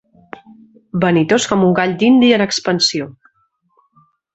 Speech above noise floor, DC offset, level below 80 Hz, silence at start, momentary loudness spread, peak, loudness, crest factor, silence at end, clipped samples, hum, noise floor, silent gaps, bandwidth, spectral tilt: 48 dB; under 0.1%; -54 dBFS; 0.95 s; 11 LU; -2 dBFS; -14 LUFS; 16 dB; 1.25 s; under 0.1%; none; -62 dBFS; none; 8.2 kHz; -4.5 dB/octave